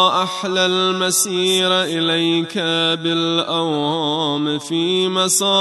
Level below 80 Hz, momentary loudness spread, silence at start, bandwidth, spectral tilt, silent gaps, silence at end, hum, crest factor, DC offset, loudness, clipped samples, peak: -70 dBFS; 4 LU; 0 s; 12.5 kHz; -3 dB/octave; none; 0 s; none; 16 dB; under 0.1%; -17 LUFS; under 0.1%; -2 dBFS